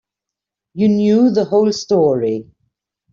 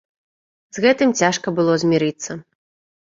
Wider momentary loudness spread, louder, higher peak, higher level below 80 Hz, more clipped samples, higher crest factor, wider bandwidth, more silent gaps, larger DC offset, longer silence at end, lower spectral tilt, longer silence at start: second, 9 LU vs 15 LU; first, -15 LUFS vs -18 LUFS; about the same, -4 dBFS vs -2 dBFS; about the same, -58 dBFS vs -62 dBFS; neither; about the same, 14 dB vs 18 dB; about the same, 7.4 kHz vs 7.8 kHz; neither; neither; about the same, 0.7 s vs 0.65 s; first, -7 dB/octave vs -4.5 dB/octave; about the same, 0.75 s vs 0.75 s